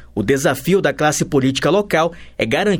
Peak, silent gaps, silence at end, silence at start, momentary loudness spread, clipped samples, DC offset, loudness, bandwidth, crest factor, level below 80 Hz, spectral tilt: 0 dBFS; none; 0 s; 0 s; 4 LU; under 0.1%; under 0.1%; -17 LUFS; over 20 kHz; 16 dB; -44 dBFS; -4.5 dB/octave